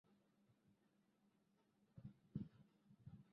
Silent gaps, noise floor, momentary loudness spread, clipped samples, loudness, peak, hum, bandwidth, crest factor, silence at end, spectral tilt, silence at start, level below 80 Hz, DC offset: none; -82 dBFS; 10 LU; under 0.1%; -59 LUFS; -36 dBFS; none; 5.2 kHz; 26 dB; 0 s; -10 dB/octave; 0.1 s; -80 dBFS; under 0.1%